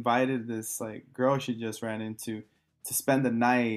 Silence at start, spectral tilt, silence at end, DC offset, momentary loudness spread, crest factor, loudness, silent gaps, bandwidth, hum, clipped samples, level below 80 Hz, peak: 0 s; -4.5 dB/octave; 0 s; under 0.1%; 13 LU; 18 dB; -30 LUFS; none; 14.5 kHz; none; under 0.1%; -76 dBFS; -10 dBFS